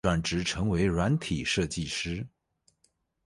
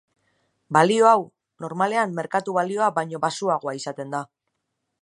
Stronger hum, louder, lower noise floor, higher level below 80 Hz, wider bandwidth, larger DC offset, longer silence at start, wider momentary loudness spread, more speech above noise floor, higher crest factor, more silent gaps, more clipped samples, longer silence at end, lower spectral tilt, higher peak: neither; second, -29 LUFS vs -22 LUFS; second, -72 dBFS vs -78 dBFS; first, -44 dBFS vs -76 dBFS; about the same, 11.5 kHz vs 11 kHz; neither; second, 0.05 s vs 0.7 s; second, 8 LU vs 15 LU; second, 44 dB vs 56 dB; about the same, 18 dB vs 22 dB; neither; neither; first, 1 s vs 0.8 s; about the same, -5 dB/octave vs -5 dB/octave; second, -12 dBFS vs -2 dBFS